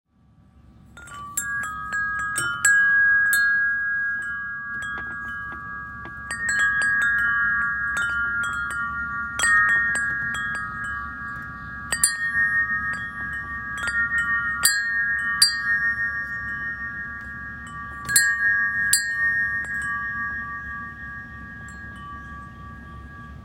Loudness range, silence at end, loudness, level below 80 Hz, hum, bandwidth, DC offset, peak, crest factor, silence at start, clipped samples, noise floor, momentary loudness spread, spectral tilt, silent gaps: 5 LU; 0 s; -22 LUFS; -48 dBFS; none; 16 kHz; under 0.1%; 0 dBFS; 24 dB; 0.55 s; under 0.1%; -56 dBFS; 18 LU; 0 dB/octave; none